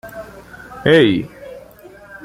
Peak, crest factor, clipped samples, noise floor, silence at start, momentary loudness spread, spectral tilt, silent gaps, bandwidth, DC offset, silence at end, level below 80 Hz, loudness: -2 dBFS; 18 dB; under 0.1%; -41 dBFS; 0.05 s; 26 LU; -6.5 dB/octave; none; 15.5 kHz; under 0.1%; 0.1 s; -48 dBFS; -14 LUFS